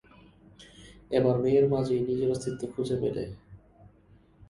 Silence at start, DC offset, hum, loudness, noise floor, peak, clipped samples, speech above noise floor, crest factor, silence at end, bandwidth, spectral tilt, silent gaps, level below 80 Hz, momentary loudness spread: 0.6 s; under 0.1%; 50 Hz at -55 dBFS; -28 LUFS; -59 dBFS; -12 dBFS; under 0.1%; 32 dB; 18 dB; 0.65 s; 11.5 kHz; -7.5 dB/octave; none; -56 dBFS; 12 LU